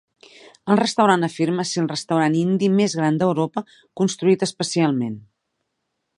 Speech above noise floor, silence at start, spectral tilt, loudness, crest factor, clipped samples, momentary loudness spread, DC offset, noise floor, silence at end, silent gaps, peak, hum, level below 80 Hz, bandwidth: 56 dB; 0.65 s; -5.5 dB/octave; -20 LUFS; 18 dB; under 0.1%; 9 LU; under 0.1%; -76 dBFS; 1 s; none; -2 dBFS; none; -68 dBFS; 11 kHz